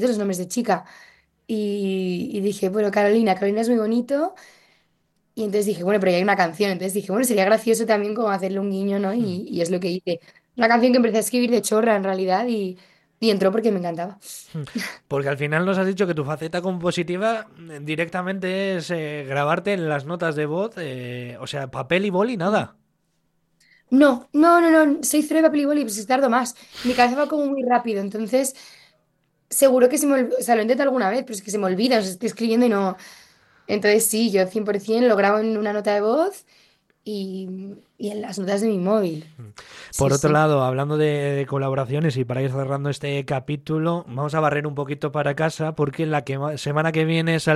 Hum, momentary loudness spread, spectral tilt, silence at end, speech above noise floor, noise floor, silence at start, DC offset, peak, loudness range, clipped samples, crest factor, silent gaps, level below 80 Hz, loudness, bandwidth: none; 12 LU; -5 dB/octave; 0 s; 47 dB; -68 dBFS; 0 s; under 0.1%; -4 dBFS; 6 LU; under 0.1%; 18 dB; none; -60 dBFS; -21 LUFS; 13 kHz